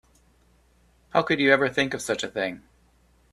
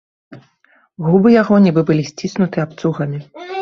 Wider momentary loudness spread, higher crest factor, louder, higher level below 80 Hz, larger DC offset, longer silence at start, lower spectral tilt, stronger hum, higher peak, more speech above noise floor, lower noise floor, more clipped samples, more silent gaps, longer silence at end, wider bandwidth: about the same, 11 LU vs 13 LU; first, 24 dB vs 14 dB; second, -24 LUFS vs -15 LUFS; about the same, -60 dBFS vs -56 dBFS; neither; first, 1.15 s vs 0.3 s; second, -4 dB/octave vs -7.5 dB/octave; neither; about the same, -2 dBFS vs -2 dBFS; second, 37 dB vs 41 dB; first, -61 dBFS vs -56 dBFS; neither; neither; first, 0.75 s vs 0 s; first, 14 kHz vs 7.2 kHz